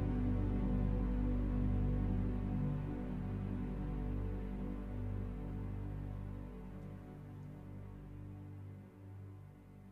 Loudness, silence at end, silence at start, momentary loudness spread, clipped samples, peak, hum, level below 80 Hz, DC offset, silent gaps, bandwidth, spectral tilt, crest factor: -41 LUFS; 0 s; 0 s; 15 LU; under 0.1%; -24 dBFS; 50 Hz at -45 dBFS; -42 dBFS; under 0.1%; none; 4.1 kHz; -10.5 dB/octave; 14 dB